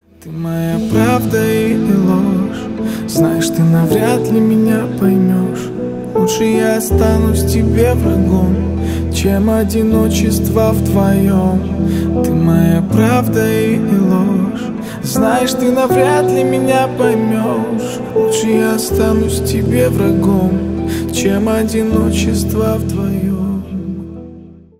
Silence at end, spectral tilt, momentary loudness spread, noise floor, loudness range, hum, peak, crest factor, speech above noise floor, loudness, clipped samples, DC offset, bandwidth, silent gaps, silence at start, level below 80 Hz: 0.25 s; -6.5 dB/octave; 7 LU; -36 dBFS; 2 LU; none; 0 dBFS; 12 dB; 23 dB; -14 LUFS; under 0.1%; under 0.1%; 16.5 kHz; none; 0.25 s; -28 dBFS